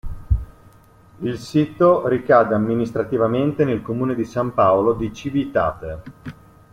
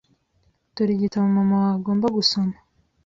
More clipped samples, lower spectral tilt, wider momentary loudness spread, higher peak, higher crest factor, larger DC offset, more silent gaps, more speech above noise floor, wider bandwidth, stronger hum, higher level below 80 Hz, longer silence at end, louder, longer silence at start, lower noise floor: neither; first, -8 dB/octave vs -6.5 dB/octave; first, 15 LU vs 7 LU; first, -2 dBFS vs -6 dBFS; about the same, 18 dB vs 16 dB; neither; neither; second, 30 dB vs 45 dB; first, 14 kHz vs 7.6 kHz; neither; first, -36 dBFS vs -58 dBFS; second, 0.4 s vs 0.55 s; about the same, -20 LUFS vs -21 LUFS; second, 0.05 s vs 0.75 s; second, -49 dBFS vs -65 dBFS